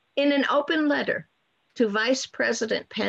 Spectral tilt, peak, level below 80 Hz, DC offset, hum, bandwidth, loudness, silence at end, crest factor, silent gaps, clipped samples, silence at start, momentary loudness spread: -3.5 dB/octave; -12 dBFS; -72 dBFS; under 0.1%; none; 8.4 kHz; -24 LUFS; 0 s; 14 dB; none; under 0.1%; 0.15 s; 5 LU